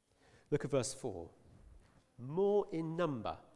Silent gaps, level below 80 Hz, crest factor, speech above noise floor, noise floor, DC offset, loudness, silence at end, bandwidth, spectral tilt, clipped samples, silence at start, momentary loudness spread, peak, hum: none; -66 dBFS; 18 dB; 31 dB; -68 dBFS; under 0.1%; -37 LUFS; 0.15 s; 12 kHz; -6 dB/octave; under 0.1%; 0.5 s; 15 LU; -20 dBFS; none